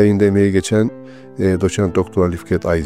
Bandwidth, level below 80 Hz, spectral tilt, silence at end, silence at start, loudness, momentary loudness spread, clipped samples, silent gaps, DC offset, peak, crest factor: 13.5 kHz; -40 dBFS; -7 dB/octave; 0 s; 0 s; -17 LUFS; 8 LU; under 0.1%; none; 0.3%; 0 dBFS; 14 dB